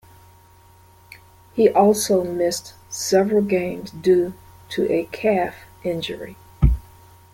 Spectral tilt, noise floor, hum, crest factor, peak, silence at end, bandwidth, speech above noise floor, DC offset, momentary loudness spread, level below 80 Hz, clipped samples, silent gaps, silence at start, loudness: -5.5 dB/octave; -50 dBFS; none; 18 dB; -2 dBFS; 0.55 s; 17 kHz; 31 dB; under 0.1%; 14 LU; -32 dBFS; under 0.1%; none; 1.55 s; -21 LUFS